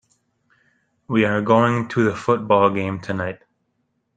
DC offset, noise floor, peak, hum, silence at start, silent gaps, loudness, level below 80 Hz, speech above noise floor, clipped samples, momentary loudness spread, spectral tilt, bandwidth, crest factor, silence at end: under 0.1%; -71 dBFS; -2 dBFS; none; 1.1 s; none; -19 LUFS; -60 dBFS; 52 dB; under 0.1%; 10 LU; -7 dB/octave; 9.2 kHz; 20 dB; 0.8 s